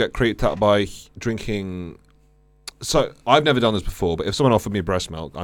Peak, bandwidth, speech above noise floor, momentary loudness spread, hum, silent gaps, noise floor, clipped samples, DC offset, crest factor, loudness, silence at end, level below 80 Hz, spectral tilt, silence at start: -2 dBFS; 18 kHz; 35 dB; 14 LU; none; none; -56 dBFS; under 0.1%; under 0.1%; 20 dB; -21 LUFS; 0 s; -38 dBFS; -5 dB/octave; 0 s